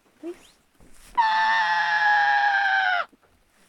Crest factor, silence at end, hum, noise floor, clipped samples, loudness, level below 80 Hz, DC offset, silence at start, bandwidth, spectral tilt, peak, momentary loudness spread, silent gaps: 14 dB; 0.65 s; none; -60 dBFS; under 0.1%; -21 LUFS; -62 dBFS; under 0.1%; 0.25 s; 11.5 kHz; -1 dB/octave; -10 dBFS; 19 LU; none